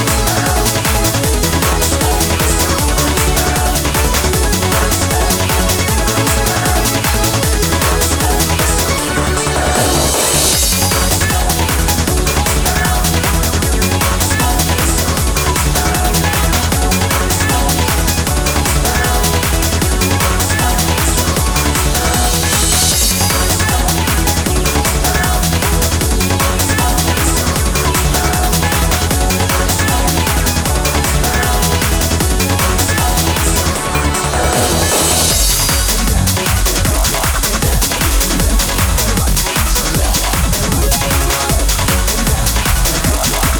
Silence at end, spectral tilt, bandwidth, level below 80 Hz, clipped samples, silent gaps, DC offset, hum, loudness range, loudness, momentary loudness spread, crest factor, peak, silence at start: 0 s; -3.5 dB/octave; over 20 kHz; -18 dBFS; under 0.1%; none; under 0.1%; none; 1 LU; -13 LUFS; 2 LU; 12 dB; 0 dBFS; 0 s